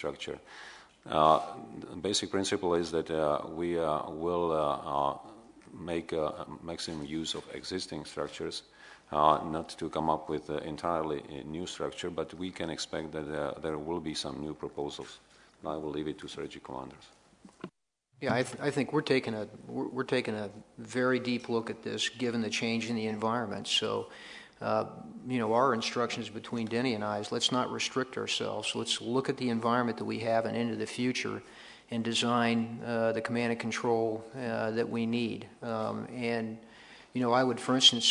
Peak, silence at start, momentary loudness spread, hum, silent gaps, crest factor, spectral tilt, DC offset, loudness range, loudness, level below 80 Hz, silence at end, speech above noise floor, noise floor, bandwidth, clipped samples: -8 dBFS; 0 s; 14 LU; none; none; 24 dB; -4 dB/octave; under 0.1%; 6 LU; -32 LUFS; -66 dBFS; 0 s; 37 dB; -70 dBFS; 11 kHz; under 0.1%